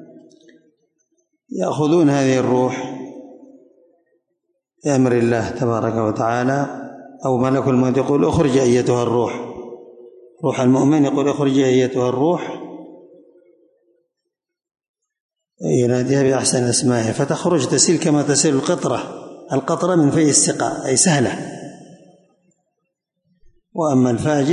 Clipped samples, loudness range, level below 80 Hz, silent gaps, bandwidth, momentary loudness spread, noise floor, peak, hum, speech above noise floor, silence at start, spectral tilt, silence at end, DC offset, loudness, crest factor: under 0.1%; 6 LU; -52 dBFS; 14.89-14.94 s, 15.20-15.29 s; 11 kHz; 17 LU; -80 dBFS; -2 dBFS; none; 64 dB; 0 s; -5 dB/octave; 0 s; under 0.1%; -17 LUFS; 18 dB